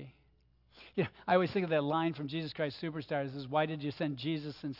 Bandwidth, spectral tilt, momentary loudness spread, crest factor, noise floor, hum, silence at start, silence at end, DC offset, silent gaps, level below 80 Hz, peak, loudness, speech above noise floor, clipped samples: 5.8 kHz; -8.5 dB/octave; 8 LU; 20 dB; -68 dBFS; none; 0 s; 0 s; under 0.1%; none; -70 dBFS; -14 dBFS; -34 LUFS; 34 dB; under 0.1%